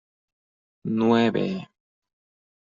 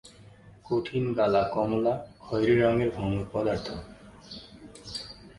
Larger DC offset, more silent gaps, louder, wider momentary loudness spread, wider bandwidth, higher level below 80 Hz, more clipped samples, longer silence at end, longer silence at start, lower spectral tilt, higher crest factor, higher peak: neither; neither; first, -23 LUFS vs -28 LUFS; second, 15 LU vs 21 LU; second, 7.4 kHz vs 11.5 kHz; second, -66 dBFS vs -52 dBFS; neither; first, 1.1 s vs 0.05 s; first, 0.85 s vs 0.05 s; second, -5.5 dB/octave vs -7 dB/octave; about the same, 20 dB vs 20 dB; first, -6 dBFS vs -10 dBFS